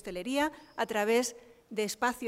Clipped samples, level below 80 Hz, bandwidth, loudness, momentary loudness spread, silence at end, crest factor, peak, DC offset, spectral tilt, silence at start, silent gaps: under 0.1%; -64 dBFS; 16 kHz; -32 LUFS; 9 LU; 0 s; 16 dB; -16 dBFS; under 0.1%; -3 dB/octave; 0.05 s; none